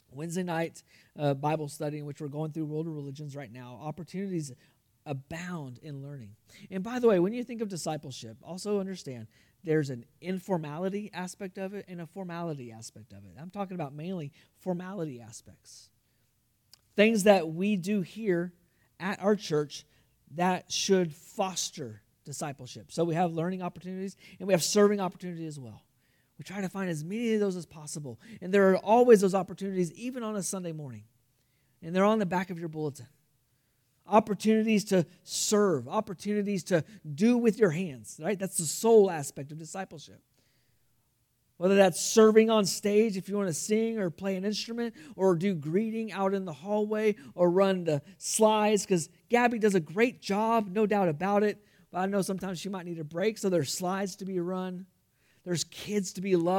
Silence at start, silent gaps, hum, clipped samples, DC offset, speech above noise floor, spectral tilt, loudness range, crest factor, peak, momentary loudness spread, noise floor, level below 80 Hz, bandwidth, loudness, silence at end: 0.15 s; none; none; under 0.1%; under 0.1%; 44 dB; -5 dB/octave; 11 LU; 22 dB; -6 dBFS; 18 LU; -73 dBFS; -74 dBFS; 18 kHz; -29 LUFS; 0 s